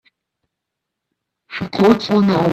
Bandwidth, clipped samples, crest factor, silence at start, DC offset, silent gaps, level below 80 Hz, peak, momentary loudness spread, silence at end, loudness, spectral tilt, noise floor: 13 kHz; under 0.1%; 18 dB; 1.5 s; under 0.1%; none; -54 dBFS; 0 dBFS; 15 LU; 0 s; -15 LUFS; -7 dB/octave; -80 dBFS